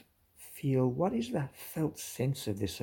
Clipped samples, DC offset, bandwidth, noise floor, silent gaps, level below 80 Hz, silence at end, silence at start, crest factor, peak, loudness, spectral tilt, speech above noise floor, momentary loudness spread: under 0.1%; under 0.1%; 18 kHz; -57 dBFS; none; -64 dBFS; 0 s; 0.4 s; 16 dB; -18 dBFS; -34 LUFS; -6.5 dB/octave; 24 dB; 9 LU